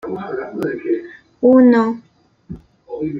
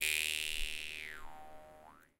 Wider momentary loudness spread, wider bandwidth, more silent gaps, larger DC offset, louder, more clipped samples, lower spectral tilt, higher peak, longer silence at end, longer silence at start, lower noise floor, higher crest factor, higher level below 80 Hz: about the same, 26 LU vs 24 LU; second, 5.6 kHz vs 17 kHz; neither; neither; first, -16 LUFS vs -37 LUFS; neither; first, -8.5 dB/octave vs 1 dB/octave; first, -2 dBFS vs -16 dBFS; second, 0 s vs 0.15 s; about the same, 0.05 s vs 0 s; second, -37 dBFS vs -59 dBFS; second, 16 dB vs 24 dB; about the same, -54 dBFS vs -52 dBFS